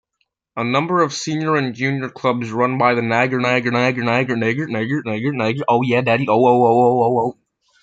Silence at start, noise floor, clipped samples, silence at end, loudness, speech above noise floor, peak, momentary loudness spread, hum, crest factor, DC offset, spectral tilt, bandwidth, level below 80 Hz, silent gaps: 0.55 s; -71 dBFS; under 0.1%; 0.5 s; -18 LUFS; 54 dB; -2 dBFS; 8 LU; none; 16 dB; under 0.1%; -6 dB/octave; 7.8 kHz; -62 dBFS; none